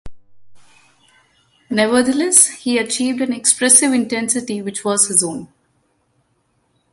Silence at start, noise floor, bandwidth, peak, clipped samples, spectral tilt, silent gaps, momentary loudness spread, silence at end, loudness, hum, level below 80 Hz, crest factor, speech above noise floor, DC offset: 0.05 s; -64 dBFS; 16 kHz; 0 dBFS; under 0.1%; -2 dB/octave; none; 12 LU; 1.45 s; -14 LUFS; none; -54 dBFS; 18 dB; 48 dB; under 0.1%